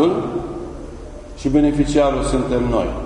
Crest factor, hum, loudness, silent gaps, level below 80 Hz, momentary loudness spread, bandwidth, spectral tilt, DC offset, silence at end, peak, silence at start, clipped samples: 16 dB; none; -19 LUFS; none; -30 dBFS; 18 LU; 11 kHz; -6.5 dB/octave; under 0.1%; 0 s; -4 dBFS; 0 s; under 0.1%